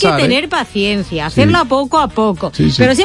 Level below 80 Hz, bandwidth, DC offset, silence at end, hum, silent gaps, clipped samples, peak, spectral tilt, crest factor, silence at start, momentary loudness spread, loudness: -36 dBFS; 11.5 kHz; under 0.1%; 0 s; none; none; under 0.1%; 0 dBFS; -5.5 dB/octave; 12 dB; 0 s; 6 LU; -13 LUFS